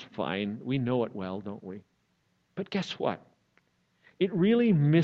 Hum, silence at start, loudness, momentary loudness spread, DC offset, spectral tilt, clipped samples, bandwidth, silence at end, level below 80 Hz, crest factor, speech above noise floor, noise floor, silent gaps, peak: none; 0 s; -29 LUFS; 19 LU; under 0.1%; -8 dB/octave; under 0.1%; 7.4 kHz; 0 s; -70 dBFS; 18 dB; 45 dB; -73 dBFS; none; -10 dBFS